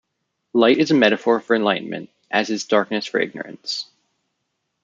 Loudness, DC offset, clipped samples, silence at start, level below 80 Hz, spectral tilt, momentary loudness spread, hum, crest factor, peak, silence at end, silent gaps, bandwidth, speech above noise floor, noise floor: -19 LUFS; under 0.1%; under 0.1%; 0.55 s; -70 dBFS; -4.5 dB/octave; 13 LU; none; 18 dB; -2 dBFS; 1 s; none; 7.6 kHz; 56 dB; -76 dBFS